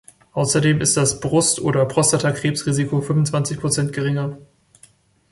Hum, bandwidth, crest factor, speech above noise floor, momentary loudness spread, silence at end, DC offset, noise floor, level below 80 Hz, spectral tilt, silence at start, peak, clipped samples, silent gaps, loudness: none; 11.5 kHz; 16 dB; 35 dB; 6 LU; 0.9 s; under 0.1%; -53 dBFS; -52 dBFS; -4.5 dB/octave; 0.35 s; -4 dBFS; under 0.1%; none; -19 LUFS